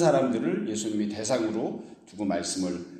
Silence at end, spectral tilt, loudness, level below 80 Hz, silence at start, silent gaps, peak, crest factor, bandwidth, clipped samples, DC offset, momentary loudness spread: 0 s; -5 dB/octave; -28 LUFS; -66 dBFS; 0 s; none; -8 dBFS; 20 dB; 13 kHz; under 0.1%; under 0.1%; 9 LU